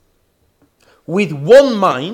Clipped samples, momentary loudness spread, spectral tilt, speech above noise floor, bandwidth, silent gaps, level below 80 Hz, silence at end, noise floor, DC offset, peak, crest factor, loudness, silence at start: under 0.1%; 10 LU; -6 dB/octave; 48 dB; 12 kHz; none; -56 dBFS; 0 s; -60 dBFS; under 0.1%; 0 dBFS; 14 dB; -12 LUFS; 1.1 s